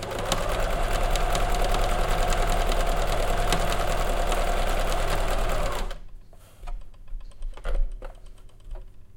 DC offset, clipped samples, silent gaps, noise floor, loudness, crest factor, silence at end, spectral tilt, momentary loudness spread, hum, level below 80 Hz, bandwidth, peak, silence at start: under 0.1%; under 0.1%; none; -44 dBFS; -27 LUFS; 18 dB; 0.05 s; -4 dB/octave; 20 LU; none; -26 dBFS; 17 kHz; -6 dBFS; 0 s